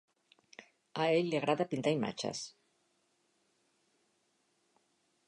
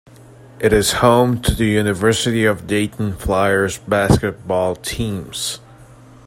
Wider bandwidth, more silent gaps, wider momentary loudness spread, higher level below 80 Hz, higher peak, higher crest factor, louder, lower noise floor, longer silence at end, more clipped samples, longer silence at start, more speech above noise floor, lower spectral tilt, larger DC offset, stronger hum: second, 11 kHz vs 16.5 kHz; neither; first, 13 LU vs 10 LU; second, -82 dBFS vs -34 dBFS; second, -18 dBFS vs 0 dBFS; about the same, 20 dB vs 16 dB; second, -34 LUFS vs -17 LUFS; first, -77 dBFS vs -43 dBFS; first, 2.8 s vs 0.4 s; neither; about the same, 0.6 s vs 0.55 s; first, 44 dB vs 26 dB; about the same, -5 dB/octave vs -5 dB/octave; neither; neither